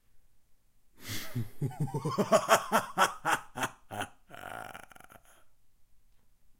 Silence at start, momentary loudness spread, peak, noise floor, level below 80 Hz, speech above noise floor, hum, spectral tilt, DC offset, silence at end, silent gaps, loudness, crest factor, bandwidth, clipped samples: 0.15 s; 18 LU; -8 dBFS; -63 dBFS; -62 dBFS; 34 dB; none; -4 dB/octave; under 0.1%; 0.05 s; none; -31 LUFS; 26 dB; 17 kHz; under 0.1%